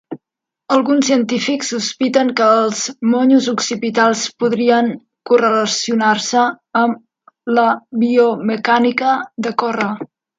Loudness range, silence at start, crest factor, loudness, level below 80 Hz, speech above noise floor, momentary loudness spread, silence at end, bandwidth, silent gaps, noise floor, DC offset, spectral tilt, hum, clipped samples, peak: 1 LU; 0.1 s; 16 dB; -15 LUFS; -68 dBFS; 67 dB; 7 LU; 0.35 s; 9.2 kHz; none; -82 dBFS; under 0.1%; -3.5 dB/octave; none; under 0.1%; 0 dBFS